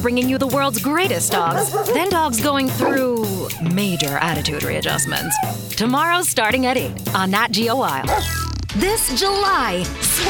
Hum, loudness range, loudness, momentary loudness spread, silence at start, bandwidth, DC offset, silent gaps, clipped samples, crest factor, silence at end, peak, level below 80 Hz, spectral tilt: none; 1 LU; -18 LUFS; 5 LU; 0 s; 19.5 kHz; under 0.1%; none; under 0.1%; 18 dB; 0 s; -2 dBFS; -38 dBFS; -3.5 dB/octave